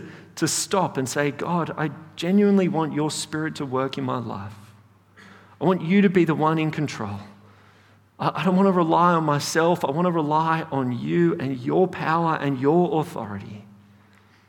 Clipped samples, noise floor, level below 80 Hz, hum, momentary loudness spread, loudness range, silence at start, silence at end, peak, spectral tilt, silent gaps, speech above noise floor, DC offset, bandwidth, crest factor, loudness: under 0.1%; -55 dBFS; -66 dBFS; none; 12 LU; 3 LU; 0 s; 0.85 s; -6 dBFS; -5.5 dB/octave; none; 33 dB; under 0.1%; 17.5 kHz; 18 dB; -22 LUFS